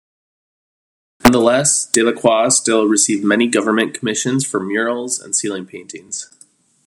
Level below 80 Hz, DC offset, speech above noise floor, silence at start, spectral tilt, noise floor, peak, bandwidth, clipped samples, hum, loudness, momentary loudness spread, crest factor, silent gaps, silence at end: -48 dBFS; under 0.1%; 35 dB; 1.25 s; -3 dB/octave; -51 dBFS; 0 dBFS; 13 kHz; under 0.1%; none; -15 LUFS; 15 LU; 18 dB; none; 0.6 s